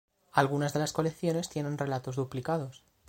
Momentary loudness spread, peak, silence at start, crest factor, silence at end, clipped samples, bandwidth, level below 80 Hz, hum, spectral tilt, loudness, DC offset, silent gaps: 6 LU; -8 dBFS; 0.35 s; 22 dB; 0.3 s; under 0.1%; 16.5 kHz; -64 dBFS; none; -5.5 dB/octave; -31 LUFS; under 0.1%; none